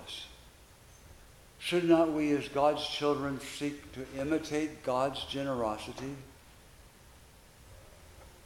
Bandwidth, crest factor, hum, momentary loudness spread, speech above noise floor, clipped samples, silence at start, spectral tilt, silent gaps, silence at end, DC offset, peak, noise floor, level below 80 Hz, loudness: 16.5 kHz; 22 dB; none; 17 LU; 25 dB; under 0.1%; 0 s; -5 dB/octave; none; 0.15 s; under 0.1%; -12 dBFS; -57 dBFS; -60 dBFS; -32 LUFS